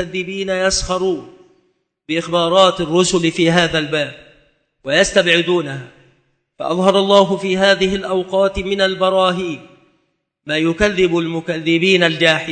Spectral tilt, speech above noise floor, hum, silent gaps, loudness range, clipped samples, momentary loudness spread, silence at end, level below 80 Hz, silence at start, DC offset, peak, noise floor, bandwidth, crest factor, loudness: -4 dB/octave; 51 dB; none; none; 3 LU; under 0.1%; 11 LU; 0 s; -40 dBFS; 0 s; under 0.1%; 0 dBFS; -67 dBFS; 9.2 kHz; 16 dB; -15 LUFS